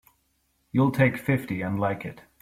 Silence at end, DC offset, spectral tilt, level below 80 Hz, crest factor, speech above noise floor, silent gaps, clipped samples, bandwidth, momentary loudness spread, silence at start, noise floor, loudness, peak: 0.2 s; under 0.1%; -8 dB/octave; -58 dBFS; 20 dB; 46 dB; none; under 0.1%; 15.5 kHz; 10 LU; 0.75 s; -71 dBFS; -25 LUFS; -6 dBFS